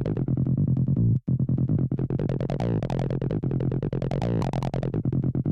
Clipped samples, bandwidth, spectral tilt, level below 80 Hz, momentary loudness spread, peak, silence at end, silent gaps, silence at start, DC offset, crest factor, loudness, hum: under 0.1%; 6.4 kHz; -10 dB/octave; -42 dBFS; 4 LU; -16 dBFS; 0 s; none; 0 s; under 0.1%; 10 dB; -26 LUFS; none